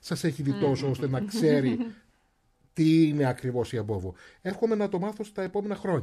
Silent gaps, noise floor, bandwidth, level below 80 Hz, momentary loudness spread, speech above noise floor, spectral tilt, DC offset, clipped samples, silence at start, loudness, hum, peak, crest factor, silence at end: none; -68 dBFS; 14 kHz; -60 dBFS; 12 LU; 42 dB; -7 dB/octave; under 0.1%; under 0.1%; 0.05 s; -27 LUFS; none; -12 dBFS; 16 dB; 0 s